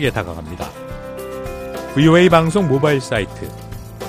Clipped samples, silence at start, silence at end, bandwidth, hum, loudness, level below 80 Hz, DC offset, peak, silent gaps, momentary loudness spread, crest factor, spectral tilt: under 0.1%; 0 s; 0 s; 15.5 kHz; none; -15 LUFS; -38 dBFS; under 0.1%; 0 dBFS; none; 20 LU; 18 dB; -6.5 dB/octave